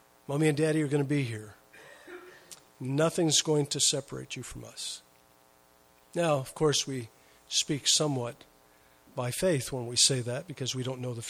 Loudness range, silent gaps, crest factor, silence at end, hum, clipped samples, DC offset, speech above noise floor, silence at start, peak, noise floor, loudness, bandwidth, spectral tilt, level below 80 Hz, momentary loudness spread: 4 LU; none; 22 dB; 0 s; none; under 0.1%; under 0.1%; 33 dB; 0.3 s; -10 dBFS; -62 dBFS; -29 LUFS; 16 kHz; -3.5 dB/octave; -62 dBFS; 18 LU